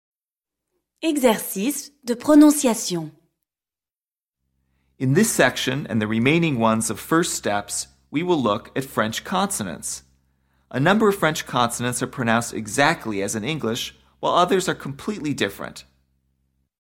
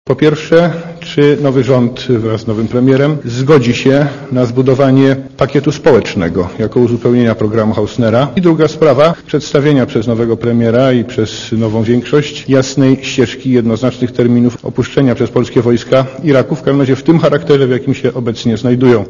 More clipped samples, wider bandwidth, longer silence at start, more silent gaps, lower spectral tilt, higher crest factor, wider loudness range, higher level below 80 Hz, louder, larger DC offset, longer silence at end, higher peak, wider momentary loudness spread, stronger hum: second, under 0.1% vs 0.7%; first, 17 kHz vs 7.4 kHz; first, 1 s vs 0.05 s; neither; second, -4.5 dB/octave vs -7 dB/octave; first, 20 dB vs 10 dB; first, 4 LU vs 1 LU; second, -56 dBFS vs -42 dBFS; second, -21 LUFS vs -11 LUFS; neither; first, 1.05 s vs 0 s; second, -4 dBFS vs 0 dBFS; first, 11 LU vs 6 LU; neither